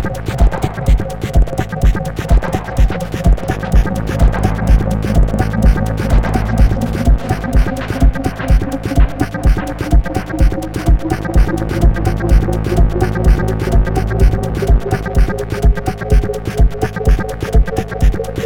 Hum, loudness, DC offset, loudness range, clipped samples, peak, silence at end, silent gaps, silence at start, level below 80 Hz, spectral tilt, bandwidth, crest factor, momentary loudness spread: none; -16 LUFS; under 0.1%; 2 LU; under 0.1%; 0 dBFS; 0 s; none; 0 s; -14 dBFS; -7 dB/octave; 14 kHz; 12 dB; 3 LU